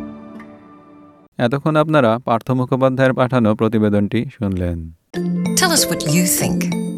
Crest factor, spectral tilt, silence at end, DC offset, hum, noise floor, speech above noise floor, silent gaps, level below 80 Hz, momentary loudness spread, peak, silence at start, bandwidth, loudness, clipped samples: 16 dB; -5 dB/octave; 0 s; under 0.1%; none; -44 dBFS; 28 dB; 1.28-1.32 s; -48 dBFS; 12 LU; -2 dBFS; 0 s; 16 kHz; -17 LUFS; under 0.1%